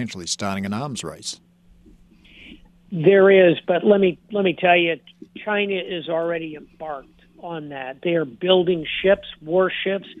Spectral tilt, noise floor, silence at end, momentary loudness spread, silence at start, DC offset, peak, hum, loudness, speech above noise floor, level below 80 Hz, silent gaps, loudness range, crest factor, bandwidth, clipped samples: -5 dB/octave; -51 dBFS; 0.05 s; 18 LU; 0 s; under 0.1%; -2 dBFS; none; -20 LUFS; 31 dB; -58 dBFS; none; 8 LU; 18 dB; 11 kHz; under 0.1%